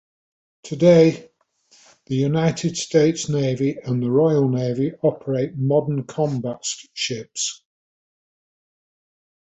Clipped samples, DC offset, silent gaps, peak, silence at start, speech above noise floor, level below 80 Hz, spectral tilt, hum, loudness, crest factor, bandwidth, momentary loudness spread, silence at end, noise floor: under 0.1%; under 0.1%; none; -2 dBFS; 0.65 s; 39 dB; -60 dBFS; -6 dB/octave; none; -20 LUFS; 18 dB; 8.4 kHz; 11 LU; 1.9 s; -59 dBFS